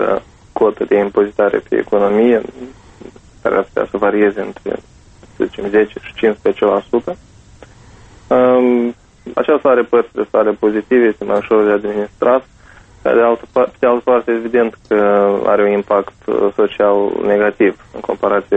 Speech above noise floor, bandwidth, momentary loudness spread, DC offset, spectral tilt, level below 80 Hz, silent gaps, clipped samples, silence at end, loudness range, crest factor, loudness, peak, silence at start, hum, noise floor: 29 dB; 8.2 kHz; 10 LU; under 0.1%; -7.5 dB/octave; -48 dBFS; none; under 0.1%; 0 s; 4 LU; 14 dB; -15 LUFS; 0 dBFS; 0 s; none; -42 dBFS